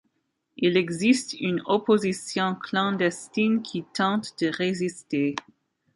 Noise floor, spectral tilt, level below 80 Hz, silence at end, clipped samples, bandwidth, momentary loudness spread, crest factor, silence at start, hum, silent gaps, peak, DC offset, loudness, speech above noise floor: -75 dBFS; -5 dB/octave; -70 dBFS; 0.55 s; under 0.1%; 11.5 kHz; 6 LU; 18 dB; 0.6 s; none; none; -8 dBFS; under 0.1%; -25 LUFS; 50 dB